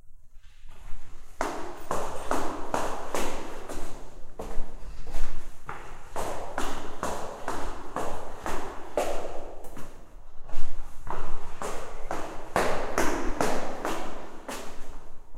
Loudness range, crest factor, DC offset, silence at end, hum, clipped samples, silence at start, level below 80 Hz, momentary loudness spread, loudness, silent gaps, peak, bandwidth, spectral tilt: 7 LU; 16 dB; under 0.1%; 0 s; none; under 0.1%; 0.05 s; -34 dBFS; 17 LU; -34 LUFS; none; -6 dBFS; 12.5 kHz; -4 dB/octave